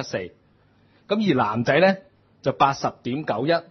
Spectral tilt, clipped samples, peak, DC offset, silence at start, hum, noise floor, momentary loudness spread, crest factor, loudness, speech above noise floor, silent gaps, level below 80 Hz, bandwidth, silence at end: -6 dB/octave; under 0.1%; -4 dBFS; under 0.1%; 0 s; none; -59 dBFS; 12 LU; 18 dB; -22 LUFS; 37 dB; none; -64 dBFS; 6.4 kHz; 0.1 s